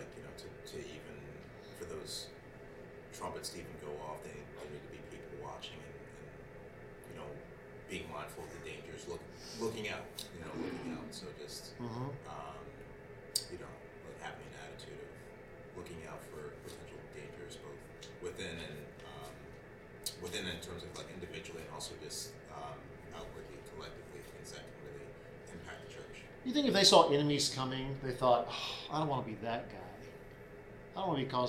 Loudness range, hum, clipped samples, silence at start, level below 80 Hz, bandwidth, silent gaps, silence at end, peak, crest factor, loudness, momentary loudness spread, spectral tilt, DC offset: 18 LU; none; under 0.1%; 0 s; -62 dBFS; 16.5 kHz; none; 0 s; -10 dBFS; 30 dB; -39 LUFS; 18 LU; -3.5 dB/octave; under 0.1%